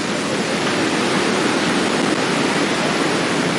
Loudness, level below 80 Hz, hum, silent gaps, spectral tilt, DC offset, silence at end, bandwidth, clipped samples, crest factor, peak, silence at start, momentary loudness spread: -18 LUFS; -56 dBFS; none; none; -3.5 dB/octave; under 0.1%; 0 s; 11.5 kHz; under 0.1%; 12 dB; -6 dBFS; 0 s; 2 LU